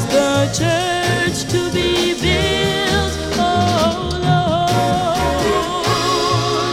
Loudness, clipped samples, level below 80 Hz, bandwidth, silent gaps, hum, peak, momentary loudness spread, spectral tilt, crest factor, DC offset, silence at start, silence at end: -16 LUFS; under 0.1%; -32 dBFS; 16.5 kHz; none; none; -2 dBFS; 3 LU; -4.5 dB/octave; 14 dB; under 0.1%; 0 s; 0 s